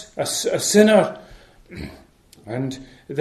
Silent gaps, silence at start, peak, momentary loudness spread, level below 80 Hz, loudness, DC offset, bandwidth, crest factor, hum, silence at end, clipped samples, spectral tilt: none; 0 s; -2 dBFS; 24 LU; -52 dBFS; -19 LUFS; under 0.1%; 13.5 kHz; 20 dB; none; 0 s; under 0.1%; -4 dB/octave